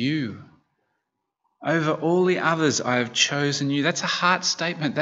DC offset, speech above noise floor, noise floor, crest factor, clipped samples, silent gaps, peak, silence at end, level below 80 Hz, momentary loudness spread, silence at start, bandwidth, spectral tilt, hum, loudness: under 0.1%; 56 dB; -79 dBFS; 20 dB; under 0.1%; none; -4 dBFS; 0 s; -72 dBFS; 5 LU; 0 s; 8 kHz; -3.5 dB/octave; none; -22 LUFS